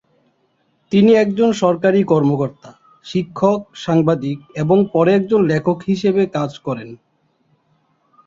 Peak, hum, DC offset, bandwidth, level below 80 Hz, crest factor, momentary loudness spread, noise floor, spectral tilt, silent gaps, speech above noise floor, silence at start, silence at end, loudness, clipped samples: -2 dBFS; none; under 0.1%; 7.6 kHz; -56 dBFS; 16 dB; 11 LU; -63 dBFS; -7.5 dB/octave; none; 47 dB; 0.9 s; 1.3 s; -16 LUFS; under 0.1%